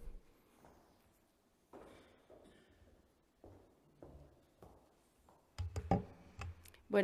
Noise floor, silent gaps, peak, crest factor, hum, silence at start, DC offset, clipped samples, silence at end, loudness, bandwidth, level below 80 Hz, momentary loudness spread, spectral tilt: -75 dBFS; none; -20 dBFS; 28 dB; none; 0 s; under 0.1%; under 0.1%; 0 s; -43 LUFS; 15 kHz; -60 dBFS; 28 LU; -7 dB/octave